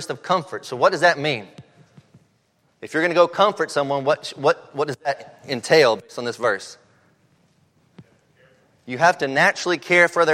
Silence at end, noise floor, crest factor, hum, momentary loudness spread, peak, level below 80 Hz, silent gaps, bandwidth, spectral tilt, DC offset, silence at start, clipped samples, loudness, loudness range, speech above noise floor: 0 s; -64 dBFS; 20 dB; none; 13 LU; -2 dBFS; -72 dBFS; none; 14.5 kHz; -4 dB/octave; under 0.1%; 0 s; under 0.1%; -20 LUFS; 3 LU; 44 dB